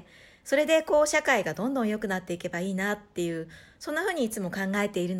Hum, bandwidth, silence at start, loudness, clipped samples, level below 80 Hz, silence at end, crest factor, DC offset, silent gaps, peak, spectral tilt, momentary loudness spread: none; 16.5 kHz; 0.45 s; -27 LUFS; under 0.1%; -62 dBFS; 0 s; 18 dB; under 0.1%; none; -10 dBFS; -4.5 dB/octave; 10 LU